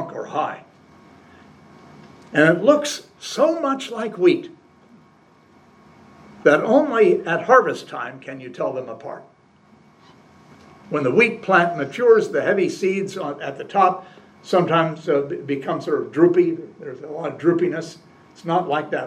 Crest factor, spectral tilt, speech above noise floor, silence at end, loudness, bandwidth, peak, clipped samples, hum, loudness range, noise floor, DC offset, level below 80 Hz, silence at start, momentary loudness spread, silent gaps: 20 dB; -5.5 dB/octave; 34 dB; 0 s; -20 LUFS; 12 kHz; 0 dBFS; under 0.1%; none; 5 LU; -53 dBFS; under 0.1%; -70 dBFS; 0 s; 16 LU; none